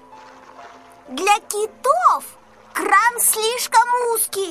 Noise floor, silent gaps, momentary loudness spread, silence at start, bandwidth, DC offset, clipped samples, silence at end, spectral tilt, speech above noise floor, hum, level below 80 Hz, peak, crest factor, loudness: -43 dBFS; none; 10 LU; 0.1 s; 15.5 kHz; under 0.1%; under 0.1%; 0 s; 0.5 dB/octave; 25 dB; none; -66 dBFS; -2 dBFS; 18 dB; -17 LUFS